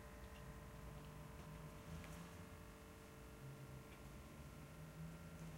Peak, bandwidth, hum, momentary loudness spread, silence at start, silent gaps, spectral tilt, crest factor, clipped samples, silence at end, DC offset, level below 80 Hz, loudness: -42 dBFS; 16.5 kHz; none; 4 LU; 0 s; none; -5.5 dB/octave; 14 dB; under 0.1%; 0 s; under 0.1%; -64 dBFS; -57 LUFS